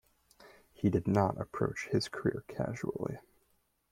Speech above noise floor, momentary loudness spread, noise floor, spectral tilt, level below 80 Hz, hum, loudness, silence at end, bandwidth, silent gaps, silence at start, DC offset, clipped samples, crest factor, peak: 41 dB; 9 LU; -74 dBFS; -7 dB/octave; -62 dBFS; none; -34 LUFS; 0.7 s; 15.5 kHz; none; 0.4 s; under 0.1%; under 0.1%; 22 dB; -14 dBFS